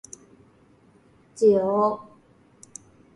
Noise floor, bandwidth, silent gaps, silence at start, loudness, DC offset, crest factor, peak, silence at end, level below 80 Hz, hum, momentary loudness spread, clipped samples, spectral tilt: -57 dBFS; 11.5 kHz; none; 1.35 s; -22 LUFS; under 0.1%; 18 dB; -8 dBFS; 1.15 s; -68 dBFS; none; 25 LU; under 0.1%; -6.5 dB/octave